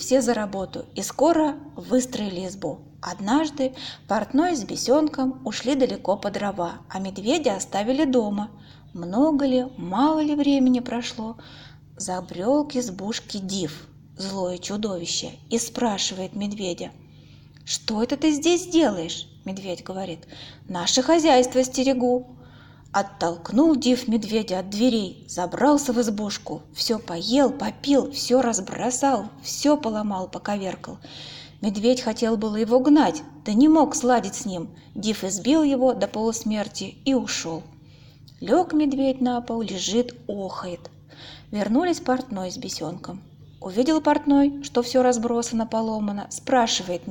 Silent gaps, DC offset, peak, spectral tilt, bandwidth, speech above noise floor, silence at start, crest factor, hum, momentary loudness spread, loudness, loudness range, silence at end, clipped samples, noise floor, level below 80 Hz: none; under 0.1%; -6 dBFS; -4 dB/octave; 17 kHz; 25 dB; 0 s; 16 dB; none; 14 LU; -23 LUFS; 6 LU; 0 s; under 0.1%; -48 dBFS; -56 dBFS